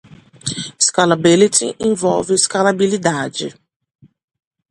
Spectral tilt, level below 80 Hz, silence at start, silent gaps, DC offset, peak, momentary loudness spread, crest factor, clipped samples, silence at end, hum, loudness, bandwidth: -3.5 dB/octave; -56 dBFS; 0.1 s; none; under 0.1%; 0 dBFS; 13 LU; 18 dB; under 0.1%; 1.2 s; none; -15 LUFS; 11.5 kHz